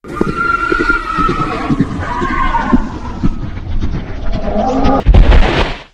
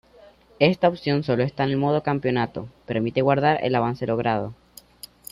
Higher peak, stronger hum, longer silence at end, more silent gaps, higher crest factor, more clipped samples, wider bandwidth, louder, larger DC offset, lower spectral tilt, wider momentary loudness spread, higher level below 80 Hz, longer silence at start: first, 0 dBFS vs -4 dBFS; neither; second, 0.1 s vs 0.8 s; neither; second, 12 dB vs 20 dB; first, 1% vs under 0.1%; second, 8.6 kHz vs 15.5 kHz; first, -15 LUFS vs -23 LUFS; neither; about the same, -7 dB/octave vs -7 dB/octave; second, 11 LU vs 14 LU; first, -16 dBFS vs -56 dBFS; second, 0.05 s vs 0.6 s